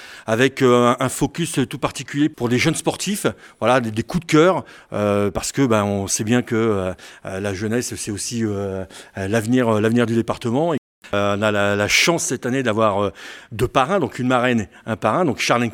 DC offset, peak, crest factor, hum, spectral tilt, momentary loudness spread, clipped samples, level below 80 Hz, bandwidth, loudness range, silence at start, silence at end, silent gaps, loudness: under 0.1%; 0 dBFS; 18 dB; none; -4.5 dB/octave; 10 LU; under 0.1%; -48 dBFS; 18 kHz; 3 LU; 0 s; 0 s; 10.78-11.02 s; -20 LUFS